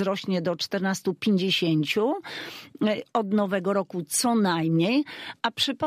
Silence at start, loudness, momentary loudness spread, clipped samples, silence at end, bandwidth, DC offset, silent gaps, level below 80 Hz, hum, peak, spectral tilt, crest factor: 0 s; -25 LUFS; 7 LU; under 0.1%; 0 s; 15.5 kHz; under 0.1%; none; -70 dBFS; none; -10 dBFS; -4.5 dB/octave; 16 dB